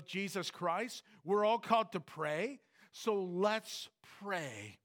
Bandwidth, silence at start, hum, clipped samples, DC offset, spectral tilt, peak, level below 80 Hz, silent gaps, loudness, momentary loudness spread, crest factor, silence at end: 19 kHz; 0 s; none; under 0.1%; under 0.1%; -4.5 dB/octave; -16 dBFS; under -90 dBFS; none; -37 LUFS; 15 LU; 20 dB; 0.1 s